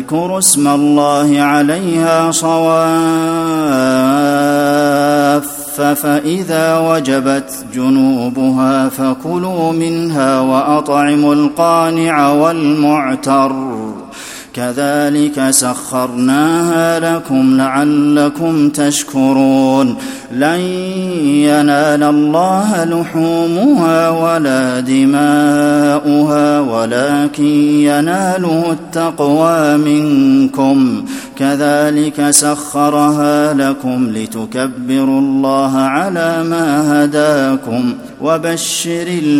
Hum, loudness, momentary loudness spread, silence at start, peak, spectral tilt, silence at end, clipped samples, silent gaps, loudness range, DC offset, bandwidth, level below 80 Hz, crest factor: none; -12 LUFS; 6 LU; 0 s; 0 dBFS; -4.5 dB/octave; 0 s; under 0.1%; none; 2 LU; under 0.1%; 16.5 kHz; -52 dBFS; 12 dB